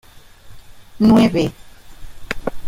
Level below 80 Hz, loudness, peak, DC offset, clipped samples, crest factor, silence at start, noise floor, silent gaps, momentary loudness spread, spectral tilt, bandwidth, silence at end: -38 dBFS; -16 LUFS; -2 dBFS; under 0.1%; under 0.1%; 16 dB; 0.45 s; -40 dBFS; none; 14 LU; -7 dB/octave; 15.5 kHz; 0 s